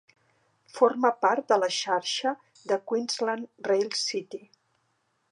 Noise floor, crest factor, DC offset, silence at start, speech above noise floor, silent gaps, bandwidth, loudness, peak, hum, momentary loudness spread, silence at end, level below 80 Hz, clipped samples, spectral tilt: -73 dBFS; 22 dB; under 0.1%; 0.75 s; 47 dB; none; 11.5 kHz; -27 LUFS; -6 dBFS; none; 12 LU; 0.95 s; -88 dBFS; under 0.1%; -2 dB/octave